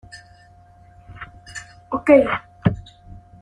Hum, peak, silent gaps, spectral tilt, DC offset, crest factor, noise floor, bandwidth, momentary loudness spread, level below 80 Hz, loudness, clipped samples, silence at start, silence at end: none; -2 dBFS; none; -7.5 dB/octave; under 0.1%; 20 dB; -49 dBFS; 10 kHz; 24 LU; -48 dBFS; -19 LUFS; under 0.1%; 0.15 s; 0.3 s